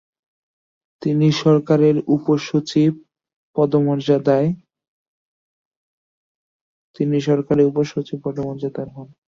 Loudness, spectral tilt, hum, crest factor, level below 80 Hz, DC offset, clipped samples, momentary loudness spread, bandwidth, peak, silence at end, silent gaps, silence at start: -19 LUFS; -7.5 dB/octave; none; 16 dB; -60 dBFS; under 0.1%; under 0.1%; 12 LU; 7.4 kHz; -4 dBFS; 0.2 s; 3.33-3.53 s, 4.88-6.94 s; 1 s